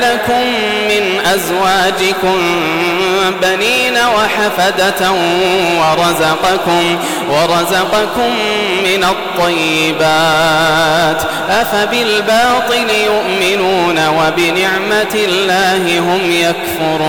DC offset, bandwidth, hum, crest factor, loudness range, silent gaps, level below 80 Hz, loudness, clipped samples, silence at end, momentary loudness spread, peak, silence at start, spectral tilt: under 0.1%; 18 kHz; none; 8 dB; 1 LU; none; -42 dBFS; -11 LUFS; under 0.1%; 0 s; 3 LU; -4 dBFS; 0 s; -3.5 dB/octave